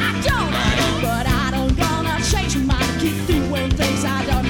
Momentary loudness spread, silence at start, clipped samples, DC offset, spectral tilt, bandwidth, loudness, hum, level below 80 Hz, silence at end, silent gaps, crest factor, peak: 2 LU; 0 s; under 0.1%; 0.2%; -4.5 dB/octave; 20 kHz; -19 LUFS; none; -26 dBFS; 0 s; none; 10 dB; -8 dBFS